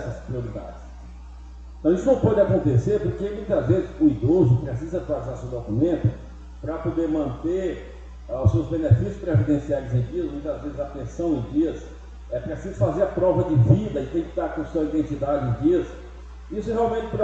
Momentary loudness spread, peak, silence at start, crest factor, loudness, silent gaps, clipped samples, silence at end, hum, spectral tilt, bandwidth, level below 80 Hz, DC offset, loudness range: 20 LU; -2 dBFS; 0 s; 20 dB; -23 LUFS; none; under 0.1%; 0 s; none; -9.5 dB/octave; 7.8 kHz; -38 dBFS; under 0.1%; 5 LU